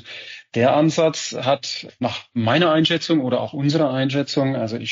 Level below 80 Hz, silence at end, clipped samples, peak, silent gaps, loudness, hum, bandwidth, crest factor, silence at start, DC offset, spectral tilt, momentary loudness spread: -68 dBFS; 0 s; under 0.1%; -6 dBFS; none; -20 LUFS; none; 7.6 kHz; 14 dB; 0.05 s; under 0.1%; -4.5 dB/octave; 10 LU